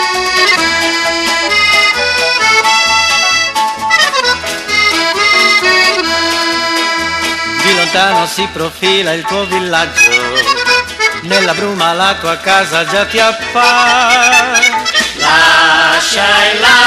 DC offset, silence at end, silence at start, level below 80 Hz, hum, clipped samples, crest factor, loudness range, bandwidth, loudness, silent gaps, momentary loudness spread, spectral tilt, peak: under 0.1%; 0 s; 0 s; -42 dBFS; none; under 0.1%; 10 dB; 3 LU; 16 kHz; -9 LUFS; none; 6 LU; -1 dB/octave; 0 dBFS